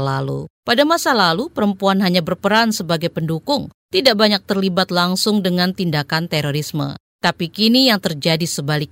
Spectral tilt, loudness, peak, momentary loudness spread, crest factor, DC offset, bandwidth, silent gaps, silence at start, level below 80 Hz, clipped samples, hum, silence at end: -4.5 dB/octave; -17 LUFS; -2 dBFS; 8 LU; 16 dB; under 0.1%; 16.5 kHz; 0.50-0.63 s, 3.74-3.89 s, 7.00-7.19 s; 0 s; -56 dBFS; under 0.1%; none; 0.05 s